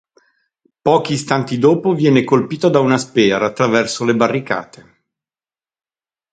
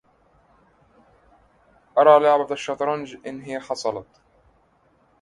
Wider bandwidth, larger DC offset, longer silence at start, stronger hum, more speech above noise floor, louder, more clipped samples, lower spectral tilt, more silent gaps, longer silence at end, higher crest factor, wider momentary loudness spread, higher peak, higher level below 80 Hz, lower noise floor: second, 9.4 kHz vs 11 kHz; neither; second, 0.85 s vs 1.95 s; neither; first, over 75 dB vs 41 dB; first, -15 LUFS vs -20 LUFS; neither; about the same, -5.5 dB/octave vs -4.5 dB/octave; neither; first, 1.7 s vs 1.2 s; second, 16 dB vs 22 dB; second, 5 LU vs 19 LU; about the same, 0 dBFS vs -2 dBFS; first, -58 dBFS vs -66 dBFS; first, under -90 dBFS vs -61 dBFS